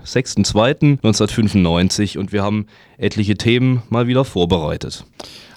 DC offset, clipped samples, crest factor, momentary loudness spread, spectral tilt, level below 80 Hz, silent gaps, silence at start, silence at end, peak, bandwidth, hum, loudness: under 0.1%; under 0.1%; 16 dB; 12 LU; -5.5 dB/octave; -40 dBFS; none; 0.05 s; 0.15 s; 0 dBFS; 14 kHz; none; -17 LUFS